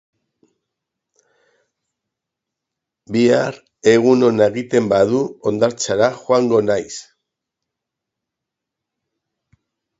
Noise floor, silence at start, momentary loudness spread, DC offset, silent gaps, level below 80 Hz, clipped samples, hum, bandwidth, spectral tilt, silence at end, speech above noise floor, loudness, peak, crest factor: -83 dBFS; 3.1 s; 9 LU; under 0.1%; none; -58 dBFS; under 0.1%; none; 8 kHz; -5.5 dB/octave; 3 s; 67 dB; -16 LUFS; 0 dBFS; 20 dB